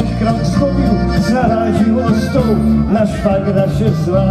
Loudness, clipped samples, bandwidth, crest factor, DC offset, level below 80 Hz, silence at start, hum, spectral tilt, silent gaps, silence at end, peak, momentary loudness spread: -14 LUFS; under 0.1%; 13.5 kHz; 12 dB; under 0.1%; -26 dBFS; 0 s; none; -8 dB/octave; none; 0 s; 0 dBFS; 2 LU